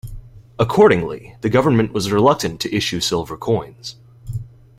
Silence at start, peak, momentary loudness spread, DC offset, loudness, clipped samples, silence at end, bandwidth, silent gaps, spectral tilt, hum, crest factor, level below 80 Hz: 0.05 s; -2 dBFS; 18 LU; under 0.1%; -18 LUFS; under 0.1%; 0.3 s; 15.5 kHz; none; -5.5 dB/octave; none; 18 dB; -42 dBFS